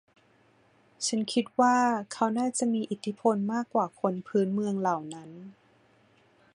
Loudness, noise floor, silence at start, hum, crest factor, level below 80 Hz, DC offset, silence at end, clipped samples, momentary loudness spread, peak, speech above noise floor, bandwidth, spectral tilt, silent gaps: -28 LUFS; -64 dBFS; 1 s; none; 20 dB; -76 dBFS; under 0.1%; 1.05 s; under 0.1%; 10 LU; -10 dBFS; 36 dB; 11 kHz; -4.5 dB/octave; none